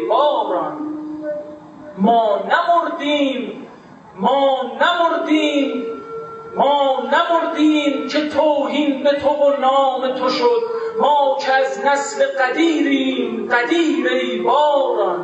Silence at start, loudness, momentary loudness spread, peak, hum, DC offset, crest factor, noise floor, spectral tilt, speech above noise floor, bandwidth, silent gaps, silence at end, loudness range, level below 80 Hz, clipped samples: 0 s; -17 LUFS; 12 LU; 0 dBFS; none; under 0.1%; 16 dB; -41 dBFS; -4.5 dB/octave; 24 dB; 8.4 kHz; none; 0 s; 3 LU; -66 dBFS; under 0.1%